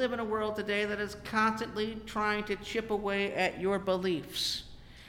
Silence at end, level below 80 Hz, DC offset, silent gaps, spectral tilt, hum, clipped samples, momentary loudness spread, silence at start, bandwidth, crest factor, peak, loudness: 0 s; -56 dBFS; under 0.1%; none; -4 dB/octave; none; under 0.1%; 6 LU; 0 s; 17 kHz; 16 dB; -16 dBFS; -32 LUFS